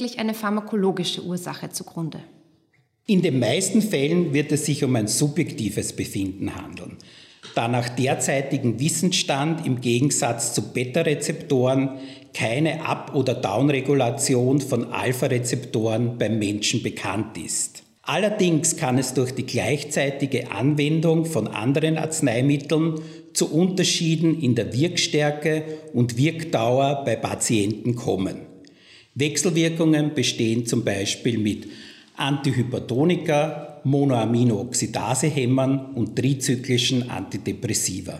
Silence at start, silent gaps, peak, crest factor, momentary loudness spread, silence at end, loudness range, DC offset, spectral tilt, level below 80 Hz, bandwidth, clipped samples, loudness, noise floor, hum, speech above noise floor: 0 s; none; -8 dBFS; 14 dB; 8 LU; 0 s; 3 LU; under 0.1%; -5 dB/octave; -66 dBFS; 16 kHz; under 0.1%; -22 LUFS; -64 dBFS; none; 42 dB